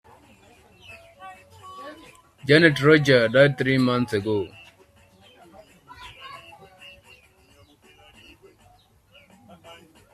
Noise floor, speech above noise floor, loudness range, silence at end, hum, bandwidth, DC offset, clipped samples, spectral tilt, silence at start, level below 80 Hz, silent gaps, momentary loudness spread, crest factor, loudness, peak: -57 dBFS; 39 dB; 12 LU; 3.75 s; none; 14 kHz; under 0.1%; under 0.1%; -6 dB/octave; 0.9 s; -60 dBFS; none; 28 LU; 24 dB; -19 LUFS; -2 dBFS